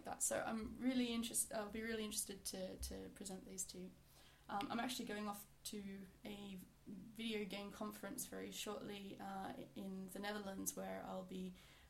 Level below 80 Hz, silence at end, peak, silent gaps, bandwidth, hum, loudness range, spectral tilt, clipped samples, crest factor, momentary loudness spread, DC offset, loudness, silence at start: -68 dBFS; 0 s; -26 dBFS; none; 16.5 kHz; none; 5 LU; -3 dB/octave; under 0.1%; 22 dB; 13 LU; under 0.1%; -47 LUFS; 0 s